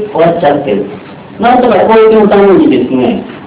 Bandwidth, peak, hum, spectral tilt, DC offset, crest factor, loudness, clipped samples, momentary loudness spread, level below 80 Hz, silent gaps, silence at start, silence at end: 4 kHz; 0 dBFS; none; -10.5 dB/octave; under 0.1%; 8 dB; -7 LUFS; 5%; 9 LU; -40 dBFS; none; 0 s; 0 s